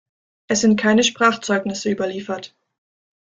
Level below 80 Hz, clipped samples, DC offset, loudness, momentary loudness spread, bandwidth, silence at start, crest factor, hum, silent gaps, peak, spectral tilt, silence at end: -60 dBFS; under 0.1%; under 0.1%; -19 LUFS; 13 LU; 9.2 kHz; 0.5 s; 20 dB; none; none; -2 dBFS; -3.5 dB/octave; 0.95 s